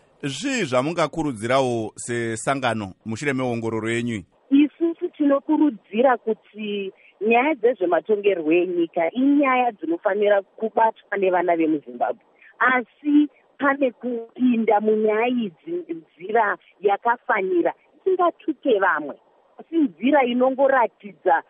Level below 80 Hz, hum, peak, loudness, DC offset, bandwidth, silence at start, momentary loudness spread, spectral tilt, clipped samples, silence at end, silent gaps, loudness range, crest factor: -62 dBFS; none; -6 dBFS; -22 LUFS; under 0.1%; 11.5 kHz; 0.25 s; 10 LU; -5.5 dB/octave; under 0.1%; 0.1 s; none; 3 LU; 16 dB